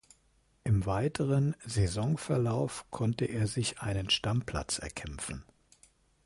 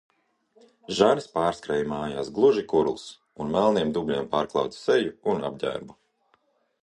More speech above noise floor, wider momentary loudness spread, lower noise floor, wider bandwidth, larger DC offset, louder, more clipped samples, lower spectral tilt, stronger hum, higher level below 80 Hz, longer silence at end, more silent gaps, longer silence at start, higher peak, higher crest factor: second, 37 dB vs 43 dB; about the same, 10 LU vs 10 LU; about the same, -69 dBFS vs -68 dBFS; about the same, 11.5 kHz vs 10.5 kHz; neither; second, -32 LUFS vs -25 LUFS; neither; about the same, -5 dB/octave vs -5.5 dB/octave; neither; first, -48 dBFS vs -58 dBFS; about the same, 0.85 s vs 0.95 s; neither; second, 0.65 s vs 0.9 s; second, -16 dBFS vs -6 dBFS; about the same, 18 dB vs 20 dB